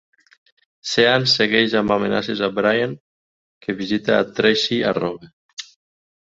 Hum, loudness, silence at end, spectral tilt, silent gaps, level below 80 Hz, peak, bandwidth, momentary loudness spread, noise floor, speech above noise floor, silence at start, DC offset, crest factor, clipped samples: none; -18 LUFS; 0.7 s; -4.5 dB/octave; 3.00-3.61 s, 5.33-5.57 s; -56 dBFS; -2 dBFS; 8 kHz; 20 LU; under -90 dBFS; over 71 dB; 0.85 s; under 0.1%; 20 dB; under 0.1%